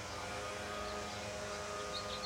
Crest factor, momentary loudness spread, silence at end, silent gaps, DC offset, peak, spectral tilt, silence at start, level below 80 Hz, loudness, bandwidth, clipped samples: 14 dB; 2 LU; 0 s; none; under 0.1%; -30 dBFS; -3 dB/octave; 0 s; -60 dBFS; -42 LUFS; 16.5 kHz; under 0.1%